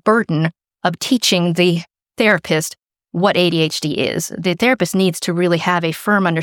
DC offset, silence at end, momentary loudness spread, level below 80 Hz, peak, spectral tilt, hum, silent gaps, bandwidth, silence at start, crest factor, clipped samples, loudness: under 0.1%; 0 s; 8 LU; -60 dBFS; -2 dBFS; -4.5 dB/octave; none; none; 18.5 kHz; 0.05 s; 16 dB; under 0.1%; -17 LUFS